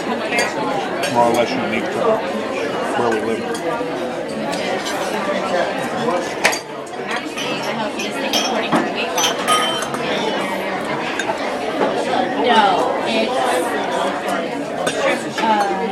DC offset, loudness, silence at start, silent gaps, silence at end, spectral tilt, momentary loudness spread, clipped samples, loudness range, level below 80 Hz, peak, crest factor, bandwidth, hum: under 0.1%; -19 LUFS; 0 s; none; 0 s; -3 dB/octave; 6 LU; under 0.1%; 3 LU; -56 dBFS; 0 dBFS; 20 dB; 16 kHz; none